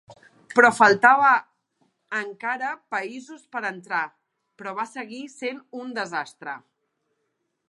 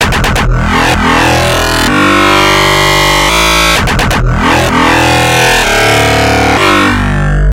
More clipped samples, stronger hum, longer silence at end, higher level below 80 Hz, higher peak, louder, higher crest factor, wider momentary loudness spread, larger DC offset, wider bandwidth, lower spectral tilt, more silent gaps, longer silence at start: second, under 0.1% vs 0.1%; neither; first, 1.1 s vs 0 s; second, -78 dBFS vs -18 dBFS; about the same, -2 dBFS vs 0 dBFS; second, -22 LUFS vs -7 LUFS; first, 24 dB vs 8 dB; first, 21 LU vs 4 LU; neither; second, 11.5 kHz vs 17 kHz; about the same, -3.5 dB/octave vs -4 dB/octave; neither; about the same, 0.1 s vs 0 s